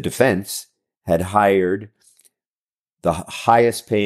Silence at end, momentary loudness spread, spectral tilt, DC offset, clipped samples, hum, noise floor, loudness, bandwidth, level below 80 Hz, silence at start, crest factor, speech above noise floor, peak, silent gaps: 0 s; 13 LU; -5 dB/octave; under 0.1%; under 0.1%; none; under -90 dBFS; -19 LUFS; 15.5 kHz; -50 dBFS; 0 s; 18 dB; over 72 dB; -2 dBFS; 2.46-2.86 s, 2.92-2.97 s